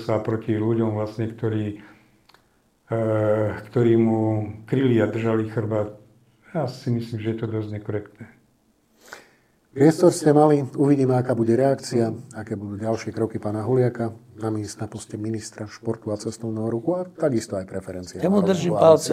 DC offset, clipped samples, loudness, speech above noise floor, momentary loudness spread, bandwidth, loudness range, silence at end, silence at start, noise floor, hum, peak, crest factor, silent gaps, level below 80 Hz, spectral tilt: under 0.1%; under 0.1%; -23 LUFS; 41 dB; 14 LU; 15 kHz; 9 LU; 0 s; 0 s; -63 dBFS; none; -2 dBFS; 22 dB; none; -64 dBFS; -7 dB/octave